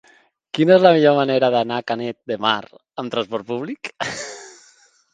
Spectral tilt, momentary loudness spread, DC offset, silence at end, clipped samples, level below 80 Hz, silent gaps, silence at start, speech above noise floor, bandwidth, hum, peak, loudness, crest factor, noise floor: -5.5 dB/octave; 17 LU; under 0.1%; 0.65 s; under 0.1%; -66 dBFS; none; 0.55 s; 37 dB; 9.4 kHz; none; 0 dBFS; -19 LUFS; 20 dB; -55 dBFS